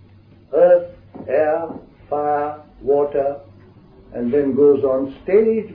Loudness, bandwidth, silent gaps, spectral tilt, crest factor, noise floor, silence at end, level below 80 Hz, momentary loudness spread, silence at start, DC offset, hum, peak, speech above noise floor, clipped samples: -18 LUFS; 4.3 kHz; none; -11 dB/octave; 14 dB; -47 dBFS; 0 s; -52 dBFS; 18 LU; 0.5 s; under 0.1%; none; -4 dBFS; 30 dB; under 0.1%